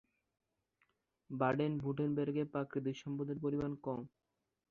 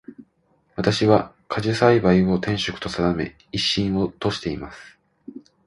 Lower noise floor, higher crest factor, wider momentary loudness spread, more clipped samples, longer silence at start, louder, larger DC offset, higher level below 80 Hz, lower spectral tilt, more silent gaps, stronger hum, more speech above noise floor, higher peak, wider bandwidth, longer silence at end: first, -80 dBFS vs -64 dBFS; about the same, 20 dB vs 20 dB; second, 8 LU vs 18 LU; neither; first, 1.3 s vs 0.1 s; second, -39 LUFS vs -21 LUFS; neither; second, -70 dBFS vs -46 dBFS; first, -7.5 dB/octave vs -6 dB/octave; neither; neither; about the same, 42 dB vs 43 dB; second, -20 dBFS vs -2 dBFS; second, 7 kHz vs 11.5 kHz; first, 0.65 s vs 0.25 s